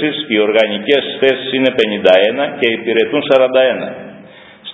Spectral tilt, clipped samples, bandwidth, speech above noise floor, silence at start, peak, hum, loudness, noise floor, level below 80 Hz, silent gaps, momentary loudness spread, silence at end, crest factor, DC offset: -6 dB/octave; under 0.1%; 8 kHz; 25 dB; 0 s; 0 dBFS; none; -13 LUFS; -38 dBFS; -60 dBFS; none; 5 LU; 0 s; 14 dB; under 0.1%